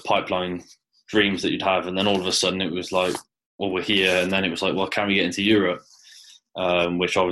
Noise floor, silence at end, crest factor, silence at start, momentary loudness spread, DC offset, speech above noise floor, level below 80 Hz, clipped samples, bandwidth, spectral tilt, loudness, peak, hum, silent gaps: -49 dBFS; 0 s; 18 dB; 0.05 s; 8 LU; under 0.1%; 27 dB; -58 dBFS; under 0.1%; 12.5 kHz; -4 dB/octave; -22 LUFS; -4 dBFS; none; 3.46-3.59 s